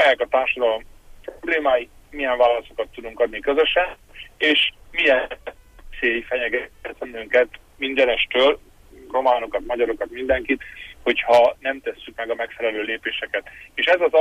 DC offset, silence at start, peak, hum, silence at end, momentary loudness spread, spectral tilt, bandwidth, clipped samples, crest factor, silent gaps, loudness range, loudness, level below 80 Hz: under 0.1%; 0 s; -6 dBFS; none; 0 s; 15 LU; -3.5 dB/octave; 13.5 kHz; under 0.1%; 16 dB; none; 2 LU; -21 LUFS; -48 dBFS